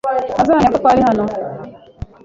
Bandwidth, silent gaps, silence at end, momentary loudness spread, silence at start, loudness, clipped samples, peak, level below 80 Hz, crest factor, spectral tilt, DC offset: 7.8 kHz; none; 0.2 s; 20 LU; 0.05 s; -14 LUFS; under 0.1%; -2 dBFS; -40 dBFS; 14 dB; -7 dB/octave; under 0.1%